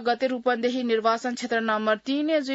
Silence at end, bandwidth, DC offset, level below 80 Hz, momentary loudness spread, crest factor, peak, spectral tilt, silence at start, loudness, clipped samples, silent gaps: 0 s; 8 kHz; under 0.1%; -72 dBFS; 3 LU; 16 dB; -10 dBFS; -4 dB/octave; 0 s; -25 LUFS; under 0.1%; none